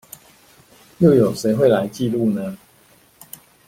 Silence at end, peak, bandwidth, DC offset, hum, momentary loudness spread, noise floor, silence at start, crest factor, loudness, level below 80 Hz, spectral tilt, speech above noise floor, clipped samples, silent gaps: 1.1 s; -2 dBFS; 16.5 kHz; under 0.1%; none; 25 LU; -53 dBFS; 1 s; 18 dB; -18 LUFS; -54 dBFS; -7 dB/octave; 37 dB; under 0.1%; none